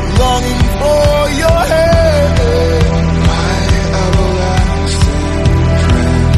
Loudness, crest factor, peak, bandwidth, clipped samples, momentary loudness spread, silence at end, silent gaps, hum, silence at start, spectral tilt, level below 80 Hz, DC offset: -12 LUFS; 10 dB; 0 dBFS; 14 kHz; under 0.1%; 3 LU; 0 s; none; none; 0 s; -6 dB/octave; -16 dBFS; under 0.1%